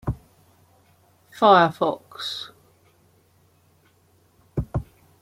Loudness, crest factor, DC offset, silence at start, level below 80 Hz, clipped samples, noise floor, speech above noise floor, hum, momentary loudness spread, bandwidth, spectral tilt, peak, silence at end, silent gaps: -22 LUFS; 22 dB; under 0.1%; 0.05 s; -46 dBFS; under 0.1%; -60 dBFS; 41 dB; none; 18 LU; 16 kHz; -6 dB/octave; -4 dBFS; 0.4 s; none